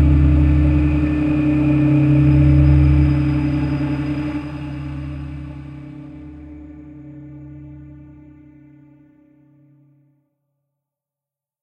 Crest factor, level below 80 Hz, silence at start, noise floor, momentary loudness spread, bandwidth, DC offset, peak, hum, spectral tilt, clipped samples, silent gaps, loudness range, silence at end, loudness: 16 dB; -24 dBFS; 0 s; -89 dBFS; 24 LU; 5.2 kHz; under 0.1%; -2 dBFS; none; -10 dB/octave; under 0.1%; none; 24 LU; 3.6 s; -17 LUFS